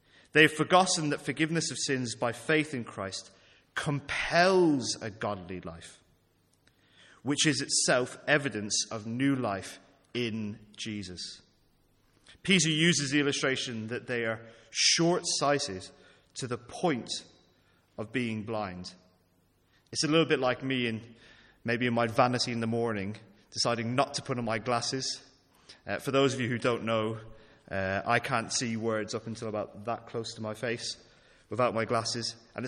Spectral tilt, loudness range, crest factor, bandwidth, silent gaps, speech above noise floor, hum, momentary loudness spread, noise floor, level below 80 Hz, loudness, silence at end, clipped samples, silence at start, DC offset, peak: -3.5 dB/octave; 6 LU; 26 dB; 14.5 kHz; none; 39 dB; none; 16 LU; -69 dBFS; -66 dBFS; -29 LUFS; 0 s; under 0.1%; 0.35 s; under 0.1%; -6 dBFS